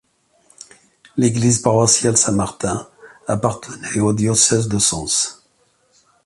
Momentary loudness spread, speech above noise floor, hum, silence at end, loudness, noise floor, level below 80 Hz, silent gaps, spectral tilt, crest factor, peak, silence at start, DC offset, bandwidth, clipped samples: 11 LU; 43 dB; none; 0.95 s; -17 LUFS; -60 dBFS; -46 dBFS; none; -4 dB/octave; 20 dB; 0 dBFS; 1.15 s; under 0.1%; 11.5 kHz; under 0.1%